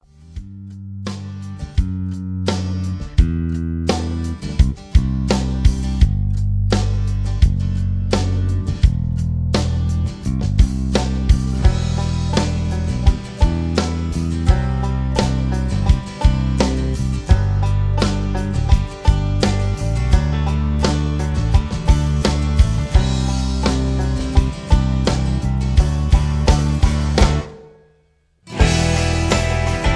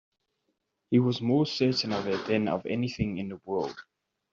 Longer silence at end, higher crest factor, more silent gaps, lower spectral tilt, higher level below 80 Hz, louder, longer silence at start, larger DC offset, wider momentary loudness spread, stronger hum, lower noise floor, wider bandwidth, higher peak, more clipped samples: second, 0 s vs 0.5 s; about the same, 16 dB vs 18 dB; neither; about the same, -6 dB/octave vs -5.5 dB/octave; first, -20 dBFS vs -58 dBFS; first, -19 LUFS vs -28 LUFS; second, 0.3 s vs 0.9 s; neither; about the same, 6 LU vs 8 LU; neither; second, -59 dBFS vs -79 dBFS; first, 11 kHz vs 7.4 kHz; first, 0 dBFS vs -12 dBFS; neither